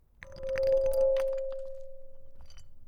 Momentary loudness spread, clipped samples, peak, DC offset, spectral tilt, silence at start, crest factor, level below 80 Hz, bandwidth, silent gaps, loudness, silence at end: 19 LU; under 0.1%; -16 dBFS; under 0.1%; -4.5 dB/octave; 0.2 s; 14 dB; -46 dBFS; 16.5 kHz; none; -30 LUFS; 0 s